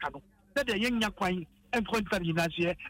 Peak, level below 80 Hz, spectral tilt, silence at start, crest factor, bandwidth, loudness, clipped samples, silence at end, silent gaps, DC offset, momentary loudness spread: -18 dBFS; -54 dBFS; -5 dB/octave; 0 s; 14 dB; 16 kHz; -31 LUFS; under 0.1%; 0 s; none; under 0.1%; 6 LU